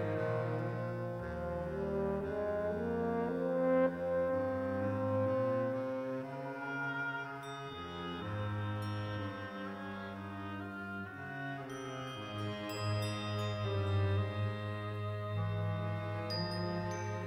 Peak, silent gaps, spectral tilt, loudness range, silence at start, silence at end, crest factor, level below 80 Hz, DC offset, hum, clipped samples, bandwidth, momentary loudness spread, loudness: -18 dBFS; none; -7 dB/octave; 7 LU; 0 s; 0 s; 18 dB; -60 dBFS; under 0.1%; none; under 0.1%; 15.5 kHz; 9 LU; -37 LUFS